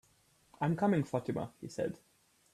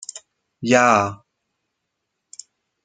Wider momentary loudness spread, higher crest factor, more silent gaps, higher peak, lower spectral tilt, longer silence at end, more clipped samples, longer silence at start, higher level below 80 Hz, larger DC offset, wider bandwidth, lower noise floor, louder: second, 10 LU vs 26 LU; about the same, 18 dB vs 22 dB; neither; second, -18 dBFS vs 0 dBFS; first, -7.5 dB/octave vs -4 dB/octave; second, 0.6 s vs 1.7 s; neither; first, 0.6 s vs 0.15 s; about the same, -70 dBFS vs -66 dBFS; neither; first, 13.5 kHz vs 9.6 kHz; second, -69 dBFS vs -78 dBFS; second, -35 LUFS vs -17 LUFS